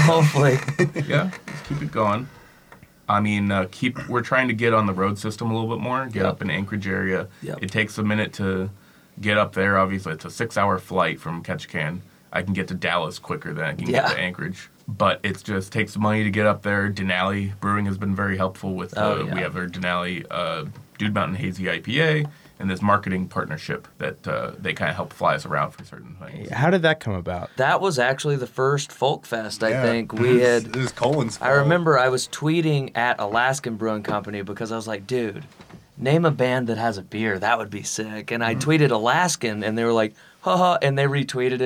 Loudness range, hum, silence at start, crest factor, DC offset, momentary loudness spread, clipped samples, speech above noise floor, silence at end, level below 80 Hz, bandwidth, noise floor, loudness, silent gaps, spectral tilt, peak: 5 LU; none; 0 s; 16 dB; under 0.1%; 10 LU; under 0.1%; 27 dB; 0 s; -58 dBFS; 16 kHz; -50 dBFS; -23 LUFS; none; -5.5 dB/octave; -6 dBFS